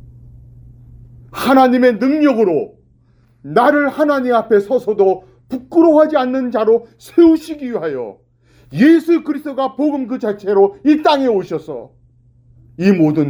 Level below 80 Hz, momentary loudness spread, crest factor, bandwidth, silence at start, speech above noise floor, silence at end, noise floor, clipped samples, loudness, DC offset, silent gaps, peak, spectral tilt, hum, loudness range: -52 dBFS; 13 LU; 14 dB; over 20 kHz; 1.35 s; 39 dB; 0 s; -52 dBFS; under 0.1%; -14 LUFS; under 0.1%; none; 0 dBFS; -7 dB/octave; none; 3 LU